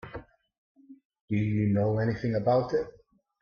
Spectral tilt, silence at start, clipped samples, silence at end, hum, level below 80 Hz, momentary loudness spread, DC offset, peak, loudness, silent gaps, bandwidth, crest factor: -9.5 dB/octave; 0.05 s; under 0.1%; 0.5 s; none; -58 dBFS; 16 LU; under 0.1%; -12 dBFS; -28 LUFS; 0.58-0.75 s, 1.05-1.10 s, 1.21-1.28 s; 6.6 kHz; 16 dB